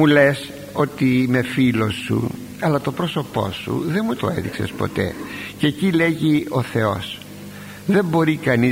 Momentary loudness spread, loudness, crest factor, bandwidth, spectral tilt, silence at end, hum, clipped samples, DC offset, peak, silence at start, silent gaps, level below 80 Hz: 11 LU; -20 LUFS; 18 dB; 16 kHz; -6.5 dB/octave; 0 s; none; under 0.1%; under 0.1%; -2 dBFS; 0 s; none; -50 dBFS